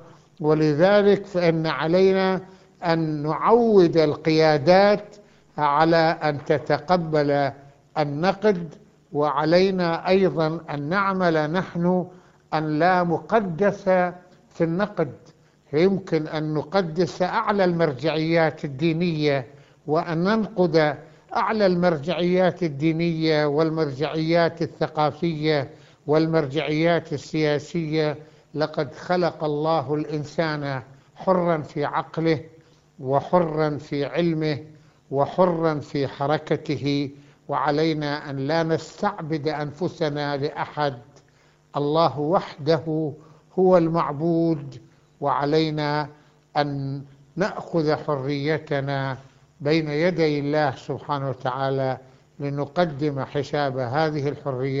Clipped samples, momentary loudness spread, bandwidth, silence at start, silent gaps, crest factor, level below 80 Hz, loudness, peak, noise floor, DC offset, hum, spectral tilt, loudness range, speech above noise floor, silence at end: under 0.1%; 10 LU; 7.6 kHz; 0 s; none; 20 dB; -58 dBFS; -23 LUFS; -4 dBFS; -58 dBFS; under 0.1%; none; -7.5 dB/octave; 6 LU; 36 dB; 0 s